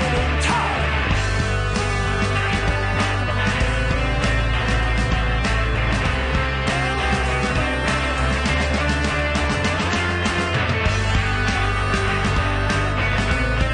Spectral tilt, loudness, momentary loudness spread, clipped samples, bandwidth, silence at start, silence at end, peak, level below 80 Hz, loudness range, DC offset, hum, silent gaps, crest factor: -5 dB/octave; -20 LUFS; 1 LU; under 0.1%; 10.5 kHz; 0 s; 0 s; -6 dBFS; -26 dBFS; 0 LU; under 0.1%; none; none; 14 dB